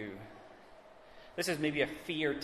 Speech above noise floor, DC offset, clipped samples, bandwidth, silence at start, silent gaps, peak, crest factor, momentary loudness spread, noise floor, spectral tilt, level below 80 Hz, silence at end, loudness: 22 dB; under 0.1%; under 0.1%; 14 kHz; 0 s; none; -18 dBFS; 20 dB; 24 LU; -56 dBFS; -4 dB/octave; -66 dBFS; 0 s; -35 LUFS